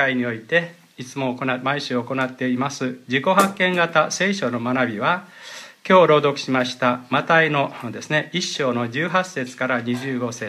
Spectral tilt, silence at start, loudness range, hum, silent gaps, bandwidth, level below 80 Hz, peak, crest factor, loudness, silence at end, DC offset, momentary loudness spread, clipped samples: -4.5 dB/octave; 0 s; 3 LU; none; none; 15 kHz; -70 dBFS; -2 dBFS; 20 dB; -20 LUFS; 0 s; under 0.1%; 11 LU; under 0.1%